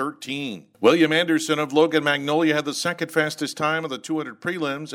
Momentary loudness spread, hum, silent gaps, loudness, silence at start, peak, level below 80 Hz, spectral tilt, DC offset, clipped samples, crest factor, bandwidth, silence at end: 10 LU; none; none; -22 LUFS; 0 s; -4 dBFS; -72 dBFS; -4 dB/octave; under 0.1%; under 0.1%; 18 dB; 16 kHz; 0 s